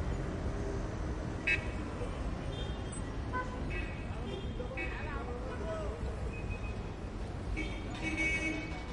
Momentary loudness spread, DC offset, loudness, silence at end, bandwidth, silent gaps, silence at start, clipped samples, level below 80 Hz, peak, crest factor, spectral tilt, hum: 8 LU; under 0.1%; -38 LUFS; 0 s; 11 kHz; none; 0 s; under 0.1%; -42 dBFS; -18 dBFS; 18 dB; -5.5 dB/octave; none